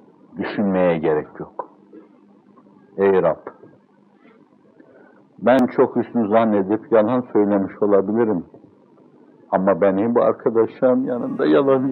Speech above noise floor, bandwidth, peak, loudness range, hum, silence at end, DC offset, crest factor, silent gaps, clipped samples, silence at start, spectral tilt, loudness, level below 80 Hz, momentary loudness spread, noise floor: 36 dB; 5.6 kHz; -2 dBFS; 7 LU; 50 Hz at -60 dBFS; 0 s; under 0.1%; 18 dB; none; under 0.1%; 0.35 s; -9.5 dB/octave; -19 LUFS; -66 dBFS; 13 LU; -54 dBFS